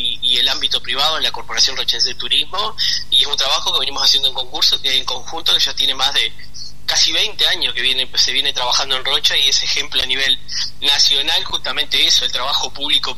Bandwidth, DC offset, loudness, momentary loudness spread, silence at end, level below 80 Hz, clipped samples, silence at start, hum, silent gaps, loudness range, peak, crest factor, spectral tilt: 13.5 kHz; 7%; -14 LUFS; 6 LU; 0.05 s; -44 dBFS; under 0.1%; 0 s; 50 Hz at -45 dBFS; none; 1 LU; -2 dBFS; 16 dB; 0.5 dB/octave